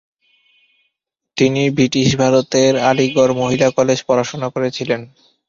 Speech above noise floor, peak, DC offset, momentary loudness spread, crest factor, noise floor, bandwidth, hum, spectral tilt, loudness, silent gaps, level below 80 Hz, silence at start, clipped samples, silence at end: 60 dB; -2 dBFS; under 0.1%; 8 LU; 16 dB; -75 dBFS; 7.6 kHz; none; -5 dB/octave; -15 LUFS; none; -52 dBFS; 1.35 s; under 0.1%; 0.4 s